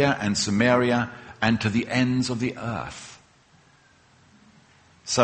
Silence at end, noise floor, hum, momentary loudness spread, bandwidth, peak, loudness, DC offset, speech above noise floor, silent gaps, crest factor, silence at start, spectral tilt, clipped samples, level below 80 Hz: 0 s; -57 dBFS; none; 16 LU; 8.8 kHz; -4 dBFS; -24 LUFS; under 0.1%; 34 dB; none; 22 dB; 0 s; -4.5 dB/octave; under 0.1%; -54 dBFS